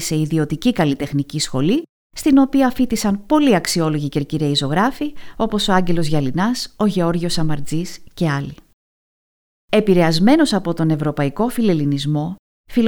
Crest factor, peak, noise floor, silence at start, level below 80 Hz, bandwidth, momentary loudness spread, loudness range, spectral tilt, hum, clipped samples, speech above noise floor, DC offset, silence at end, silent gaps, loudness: 16 dB; -2 dBFS; under -90 dBFS; 0 s; -40 dBFS; 20 kHz; 9 LU; 4 LU; -5.5 dB/octave; none; under 0.1%; over 73 dB; under 0.1%; 0 s; 1.89-2.10 s, 8.73-9.68 s, 12.39-12.64 s; -18 LUFS